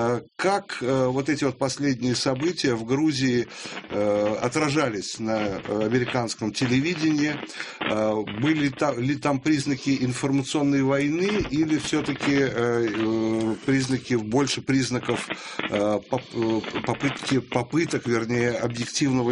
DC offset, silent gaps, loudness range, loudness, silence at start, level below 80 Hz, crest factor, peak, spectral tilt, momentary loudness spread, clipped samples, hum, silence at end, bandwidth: under 0.1%; none; 2 LU; -24 LUFS; 0 s; -54 dBFS; 18 dB; -6 dBFS; -5 dB/octave; 4 LU; under 0.1%; none; 0 s; 10.5 kHz